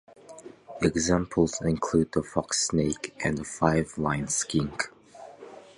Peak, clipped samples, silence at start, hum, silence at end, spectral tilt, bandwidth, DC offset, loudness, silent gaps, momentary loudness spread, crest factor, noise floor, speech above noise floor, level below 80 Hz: -6 dBFS; under 0.1%; 0.3 s; none; 0.15 s; -4.5 dB/octave; 11.5 kHz; under 0.1%; -27 LUFS; none; 21 LU; 22 dB; -48 dBFS; 21 dB; -48 dBFS